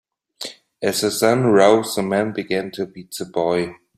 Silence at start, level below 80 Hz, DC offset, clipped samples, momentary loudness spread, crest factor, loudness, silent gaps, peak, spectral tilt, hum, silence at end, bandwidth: 0.4 s; -60 dBFS; under 0.1%; under 0.1%; 18 LU; 18 dB; -19 LUFS; none; -2 dBFS; -4.5 dB/octave; none; 0.2 s; 16 kHz